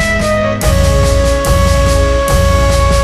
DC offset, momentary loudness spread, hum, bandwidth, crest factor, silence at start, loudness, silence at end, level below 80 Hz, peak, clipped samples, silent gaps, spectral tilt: under 0.1%; 2 LU; none; 15 kHz; 10 dB; 0 s; -11 LUFS; 0 s; -14 dBFS; 0 dBFS; under 0.1%; none; -5 dB/octave